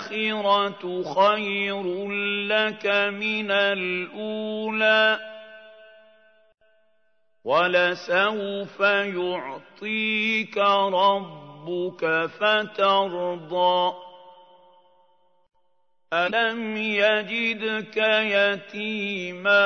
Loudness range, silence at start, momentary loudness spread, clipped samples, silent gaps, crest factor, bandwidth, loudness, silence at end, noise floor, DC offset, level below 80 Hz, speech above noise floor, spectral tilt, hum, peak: 4 LU; 0 s; 10 LU; under 0.1%; none; 18 dB; 6.6 kHz; -23 LUFS; 0 s; -73 dBFS; under 0.1%; -78 dBFS; 50 dB; -5 dB/octave; none; -6 dBFS